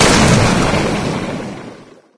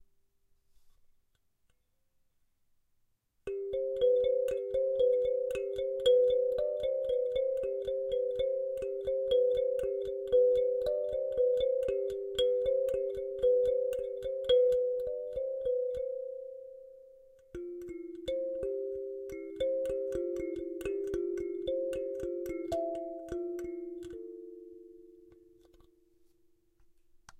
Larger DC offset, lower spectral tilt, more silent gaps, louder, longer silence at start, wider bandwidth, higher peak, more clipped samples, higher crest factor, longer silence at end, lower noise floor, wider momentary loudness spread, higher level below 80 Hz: neither; about the same, -4.5 dB/octave vs -5.5 dB/octave; neither; first, -14 LUFS vs -32 LUFS; second, 0 s vs 0.85 s; about the same, 11 kHz vs 10 kHz; first, 0 dBFS vs -16 dBFS; neither; about the same, 14 dB vs 16 dB; about the same, 0.15 s vs 0.05 s; second, -37 dBFS vs -74 dBFS; first, 20 LU vs 15 LU; first, -28 dBFS vs -60 dBFS